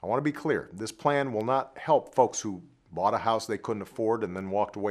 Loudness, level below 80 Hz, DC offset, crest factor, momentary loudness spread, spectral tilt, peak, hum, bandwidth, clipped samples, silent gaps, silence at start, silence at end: -29 LUFS; -68 dBFS; under 0.1%; 20 dB; 9 LU; -5 dB/octave; -8 dBFS; none; 14.5 kHz; under 0.1%; none; 0.05 s; 0 s